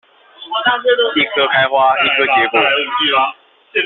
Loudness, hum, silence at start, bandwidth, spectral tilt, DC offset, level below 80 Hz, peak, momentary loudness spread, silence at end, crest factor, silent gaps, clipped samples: -13 LUFS; none; 0.4 s; 4.2 kHz; 1 dB/octave; under 0.1%; -60 dBFS; -2 dBFS; 5 LU; 0 s; 12 dB; none; under 0.1%